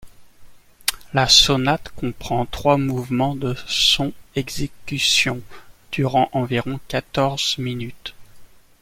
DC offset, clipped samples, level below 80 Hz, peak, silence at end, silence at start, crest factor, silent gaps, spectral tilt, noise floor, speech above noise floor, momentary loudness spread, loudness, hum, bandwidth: under 0.1%; under 0.1%; -42 dBFS; 0 dBFS; 0.35 s; 0 s; 22 dB; none; -3.5 dB/octave; -43 dBFS; 22 dB; 14 LU; -19 LUFS; none; 16.5 kHz